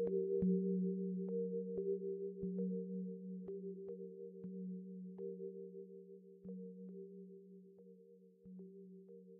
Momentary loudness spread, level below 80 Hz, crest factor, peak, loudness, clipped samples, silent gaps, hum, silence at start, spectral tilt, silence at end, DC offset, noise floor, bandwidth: 21 LU; -76 dBFS; 18 dB; -26 dBFS; -44 LUFS; under 0.1%; none; none; 0 s; -12.5 dB/octave; 0 s; under 0.1%; -64 dBFS; 1.2 kHz